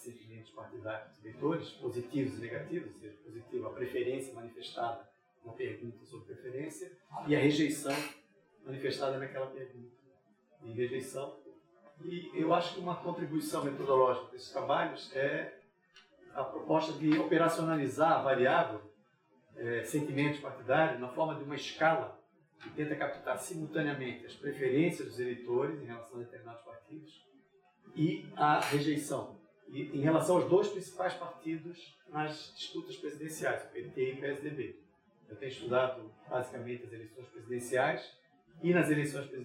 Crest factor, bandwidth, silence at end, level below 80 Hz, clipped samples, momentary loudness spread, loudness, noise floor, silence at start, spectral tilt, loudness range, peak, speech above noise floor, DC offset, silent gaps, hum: 22 dB; 16.5 kHz; 0 s; -80 dBFS; under 0.1%; 19 LU; -34 LUFS; -69 dBFS; 0 s; -5.5 dB/octave; 9 LU; -14 dBFS; 35 dB; under 0.1%; none; none